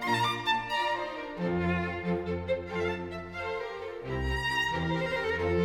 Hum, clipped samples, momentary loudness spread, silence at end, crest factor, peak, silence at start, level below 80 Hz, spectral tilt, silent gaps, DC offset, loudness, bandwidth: none; under 0.1%; 8 LU; 0 s; 14 dB; -16 dBFS; 0 s; -46 dBFS; -5.5 dB/octave; none; under 0.1%; -31 LUFS; 16 kHz